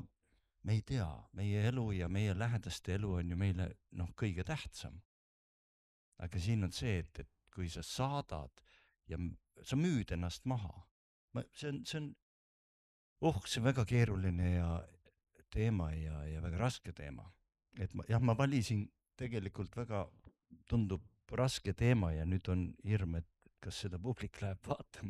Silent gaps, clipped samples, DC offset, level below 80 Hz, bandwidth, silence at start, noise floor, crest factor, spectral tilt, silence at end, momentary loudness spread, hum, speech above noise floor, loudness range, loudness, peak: 5.05-6.12 s, 10.91-11.28 s, 12.22-13.16 s; under 0.1%; under 0.1%; -52 dBFS; 13 kHz; 0 s; -78 dBFS; 20 dB; -6.5 dB/octave; 0 s; 15 LU; none; 40 dB; 5 LU; -39 LUFS; -20 dBFS